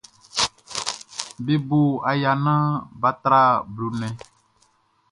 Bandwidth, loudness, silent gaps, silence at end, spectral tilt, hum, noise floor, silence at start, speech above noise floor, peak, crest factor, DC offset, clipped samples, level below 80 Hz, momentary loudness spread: 11.5 kHz; -22 LUFS; none; 0.95 s; -5 dB/octave; none; -63 dBFS; 0.35 s; 42 dB; -2 dBFS; 20 dB; under 0.1%; under 0.1%; -58 dBFS; 13 LU